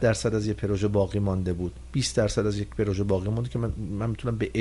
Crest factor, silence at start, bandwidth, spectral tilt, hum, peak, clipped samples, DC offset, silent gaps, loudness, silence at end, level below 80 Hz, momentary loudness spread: 16 dB; 0 s; 11.5 kHz; -6 dB/octave; none; -10 dBFS; under 0.1%; under 0.1%; none; -27 LUFS; 0 s; -42 dBFS; 6 LU